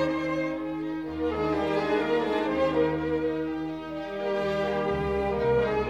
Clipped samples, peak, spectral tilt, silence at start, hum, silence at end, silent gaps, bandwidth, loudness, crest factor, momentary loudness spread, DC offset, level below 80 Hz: under 0.1%; -14 dBFS; -7 dB/octave; 0 s; none; 0 s; none; 9.4 kHz; -28 LUFS; 14 dB; 7 LU; 0.1%; -48 dBFS